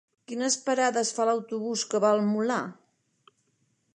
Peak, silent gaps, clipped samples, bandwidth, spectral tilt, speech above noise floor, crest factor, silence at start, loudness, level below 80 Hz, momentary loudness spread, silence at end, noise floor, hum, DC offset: -10 dBFS; none; under 0.1%; 11 kHz; -3.5 dB/octave; 46 dB; 18 dB; 0.3 s; -26 LUFS; -84 dBFS; 8 LU; 1.2 s; -72 dBFS; none; under 0.1%